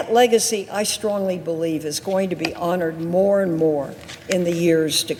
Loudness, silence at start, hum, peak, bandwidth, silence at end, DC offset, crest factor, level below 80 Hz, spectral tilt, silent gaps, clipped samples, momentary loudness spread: -20 LUFS; 0 s; none; -2 dBFS; 17.5 kHz; 0 s; under 0.1%; 18 dB; -60 dBFS; -4 dB/octave; none; under 0.1%; 7 LU